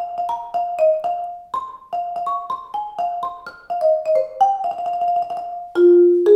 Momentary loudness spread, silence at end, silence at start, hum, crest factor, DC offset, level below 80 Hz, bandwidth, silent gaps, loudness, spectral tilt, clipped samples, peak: 15 LU; 0 s; 0 s; none; 16 dB; under 0.1%; -64 dBFS; 6.2 kHz; none; -20 LUFS; -6.5 dB/octave; under 0.1%; -4 dBFS